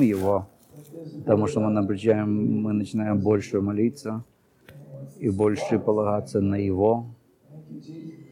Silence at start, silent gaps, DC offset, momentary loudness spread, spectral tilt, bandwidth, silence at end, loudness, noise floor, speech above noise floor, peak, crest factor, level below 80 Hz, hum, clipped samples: 0 s; none; under 0.1%; 20 LU; -8 dB/octave; 15.5 kHz; 0.1 s; -24 LUFS; -50 dBFS; 26 dB; -8 dBFS; 18 dB; -62 dBFS; none; under 0.1%